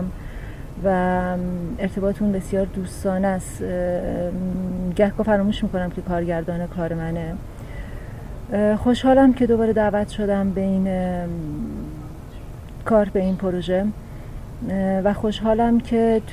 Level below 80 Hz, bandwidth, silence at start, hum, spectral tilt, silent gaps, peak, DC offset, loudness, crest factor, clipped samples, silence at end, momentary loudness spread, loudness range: -36 dBFS; 14.5 kHz; 0 s; none; -7.5 dB/octave; none; -4 dBFS; 0.3%; -22 LUFS; 16 dB; under 0.1%; 0 s; 17 LU; 5 LU